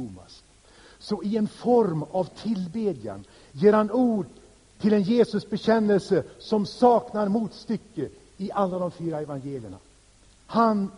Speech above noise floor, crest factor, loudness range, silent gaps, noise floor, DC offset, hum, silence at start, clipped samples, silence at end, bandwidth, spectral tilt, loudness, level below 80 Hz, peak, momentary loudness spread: 32 dB; 20 dB; 5 LU; none; -56 dBFS; under 0.1%; none; 0 s; under 0.1%; 0.05 s; 10.5 kHz; -7.5 dB/octave; -25 LUFS; -60 dBFS; -6 dBFS; 16 LU